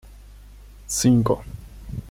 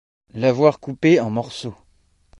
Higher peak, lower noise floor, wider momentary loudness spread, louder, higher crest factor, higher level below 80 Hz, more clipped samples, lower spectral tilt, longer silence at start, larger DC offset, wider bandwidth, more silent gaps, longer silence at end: second, -8 dBFS vs -2 dBFS; second, -44 dBFS vs -59 dBFS; first, 22 LU vs 17 LU; about the same, -21 LUFS vs -19 LUFS; about the same, 18 dB vs 20 dB; first, -42 dBFS vs -58 dBFS; neither; second, -5.5 dB/octave vs -7 dB/octave; second, 0.05 s vs 0.35 s; neither; first, 16.5 kHz vs 11 kHz; neither; second, 0 s vs 0.65 s